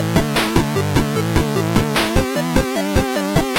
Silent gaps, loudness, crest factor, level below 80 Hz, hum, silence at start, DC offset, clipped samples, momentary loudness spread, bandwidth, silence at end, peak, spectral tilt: none; -18 LUFS; 14 dB; -28 dBFS; none; 0 s; under 0.1%; under 0.1%; 2 LU; 16.5 kHz; 0 s; -2 dBFS; -5 dB/octave